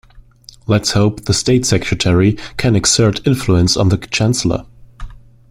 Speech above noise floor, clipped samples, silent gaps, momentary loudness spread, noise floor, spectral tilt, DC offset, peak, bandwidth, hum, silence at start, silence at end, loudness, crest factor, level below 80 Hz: 28 dB; under 0.1%; none; 6 LU; -41 dBFS; -4.5 dB/octave; under 0.1%; 0 dBFS; 15.5 kHz; none; 0.15 s; 0.35 s; -14 LUFS; 16 dB; -34 dBFS